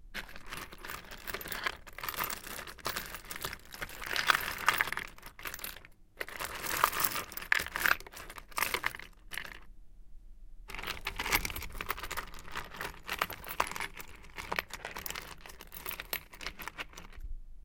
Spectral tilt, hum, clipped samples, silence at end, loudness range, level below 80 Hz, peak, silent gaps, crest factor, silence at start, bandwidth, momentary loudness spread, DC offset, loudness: -1 dB/octave; none; under 0.1%; 0.05 s; 7 LU; -50 dBFS; -6 dBFS; none; 32 dB; 0 s; 17 kHz; 16 LU; under 0.1%; -36 LUFS